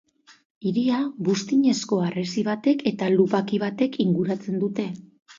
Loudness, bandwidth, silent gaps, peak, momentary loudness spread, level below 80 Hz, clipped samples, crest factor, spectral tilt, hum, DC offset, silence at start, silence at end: -24 LUFS; 7.6 kHz; 0.45-0.61 s; -6 dBFS; 6 LU; -70 dBFS; under 0.1%; 18 dB; -6 dB/octave; none; under 0.1%; 0.3 s; 0.05 s